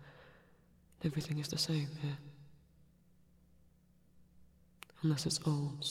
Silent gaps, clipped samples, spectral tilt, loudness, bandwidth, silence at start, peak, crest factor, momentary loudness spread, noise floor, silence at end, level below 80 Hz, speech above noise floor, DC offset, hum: none; under 0.1%; -5 dB/octave; -37 LUFS; 15.5 kHz; 0 s; -22 dBFS; 20 dB; 23 LU; -67 dBFS; 0 s; -68 dBFS; 31 dB; under 0.1%; none